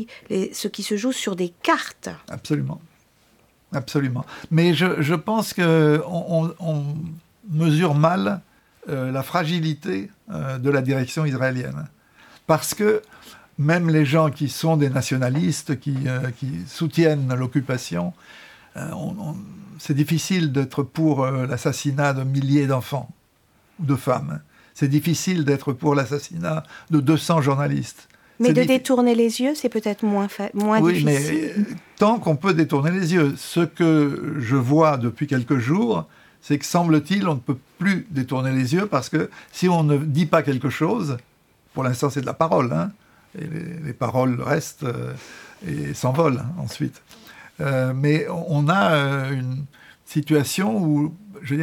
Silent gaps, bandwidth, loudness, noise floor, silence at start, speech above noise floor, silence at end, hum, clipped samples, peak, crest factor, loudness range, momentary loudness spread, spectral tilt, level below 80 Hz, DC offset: none; 17.5 kHz; -22 LUFS; -60 dBFS; 0 s; 39 dB; 0 s; none; under 0.1%; -2 dBFS; 20 dB; 5 LU; 13 LU; -6.5 dB/octave; -60 dBFS; under 0.1%